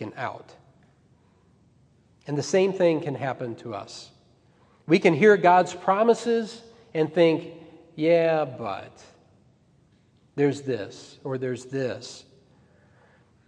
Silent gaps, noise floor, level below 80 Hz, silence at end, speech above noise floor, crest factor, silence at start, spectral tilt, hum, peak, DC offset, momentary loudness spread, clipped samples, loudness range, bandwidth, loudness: none; -61 dBFS; -72 dBFS; 1.25 s; 37 dB; 22 dB; 0 s; -6 dB/octave; none; -4 dBFS; under 0.1%; 23 LU; under 0.1%; 10 LU; 10 kHz; -24 LUFS